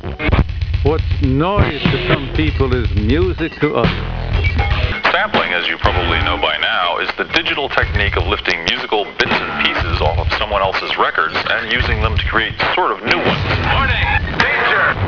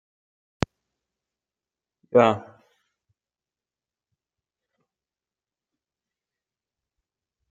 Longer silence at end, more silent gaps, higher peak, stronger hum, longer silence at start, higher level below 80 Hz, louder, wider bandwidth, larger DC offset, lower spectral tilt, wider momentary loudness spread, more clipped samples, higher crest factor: second, 0 s vs 5.1 s; neither; about the same, 0 dBFS vs -2 dBFS; neither; second, 0 s vs 2.15 s; first, -24 dBFS vs -58 dBFS; first, -16 LUFS vs -23 LUFS; second, 5.4 kHz vs 7.8 kHz; neither; about the same, -6 dB/octave vs -6.5 dB/octave; second, 3 LU vs 13 LU; neither; second, 16 dB vs 30 dB